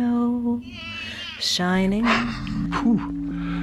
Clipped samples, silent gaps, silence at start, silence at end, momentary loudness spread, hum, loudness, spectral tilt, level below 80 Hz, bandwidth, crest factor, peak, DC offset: under 0.1%; none; 0 s; 0 s; 10 LU; none; -24 LUFS; -5 dB/octave; -42 dBFS; 13.5 kHz; 16 dB; -8 dBFS; under 0.1%